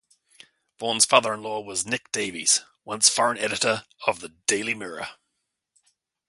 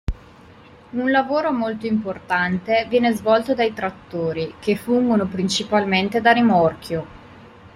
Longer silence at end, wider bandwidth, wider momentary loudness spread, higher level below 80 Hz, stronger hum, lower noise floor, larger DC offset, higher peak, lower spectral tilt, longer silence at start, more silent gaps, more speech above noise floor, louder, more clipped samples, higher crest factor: first, 1.15 s vs 0.1 s; second, 12 kHz vs 15.5 kHz; about the same, 13 LU vs 12 LU; second, -68 dBFS vs -42 dBFS; neither; first, -79 dBFS vs -46 dBFS; neither; about the same, 0 dBFS vs -2 dBFS; second, -1 dB/octave vs -5.5 dB/octave; first, 0.8 s vs 0.1 s; neither; first, 55 dB vs 26 dB; second, -23 LUFS vs -20 LUFS; neither; first, 26 dB vs 18 dB